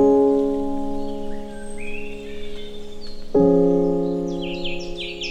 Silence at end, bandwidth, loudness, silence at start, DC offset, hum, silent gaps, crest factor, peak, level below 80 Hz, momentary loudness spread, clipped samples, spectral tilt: 0 s; 9 kHz; -22 LUFS; 0 s; under 0.1%; none; none; 16 dB; -4 dBFS; -36 dBFS; 19 LU; under 0.1%; -7 dB/octave